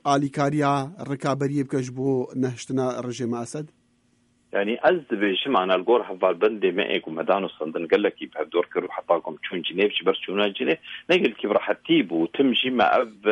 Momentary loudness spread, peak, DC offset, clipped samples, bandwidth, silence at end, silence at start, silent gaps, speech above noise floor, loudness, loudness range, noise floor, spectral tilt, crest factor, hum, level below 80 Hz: 8 LU; -6 dBFS; under 0.1%; under 0.1%; 11 kHz; 0 s; 0.05 s; none; 41 dB; -24 LUFS; 5 LU; -64 dBFS; -5.5 dB/octave; 18 dB; none; -68 dBFS